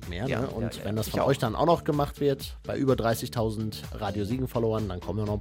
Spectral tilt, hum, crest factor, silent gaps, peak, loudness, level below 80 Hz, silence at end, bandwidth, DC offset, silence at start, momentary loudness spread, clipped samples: -6.5 dB/octave; none; 18 dB; none; -10 dBFS; -28 LUFS; -44 dBFS; 0 s; 16.5 kHz; under 0.1%; 0 s; 8 LU; under 0.1%